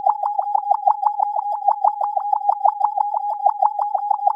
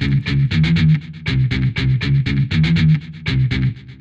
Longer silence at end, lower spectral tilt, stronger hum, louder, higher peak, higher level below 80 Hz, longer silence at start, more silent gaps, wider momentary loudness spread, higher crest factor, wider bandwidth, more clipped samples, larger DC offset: about the same, 0 s vs 0.05 s; second, 0.5 dB/octave vs -7.5 dB/octave; neither; second, -20 LUFS vs -17 LUFS; about the same, -4 dBFS vs -6 dBFS; second, under -90 dBFS vs -30 dBFS; about the same, 0 s vs 0 s; neither; second, 3 LU vs 6 LU; about the same, 16 dB vs 12 dB; second, 5.2 kHz vs 7.4 kHz; neither; neither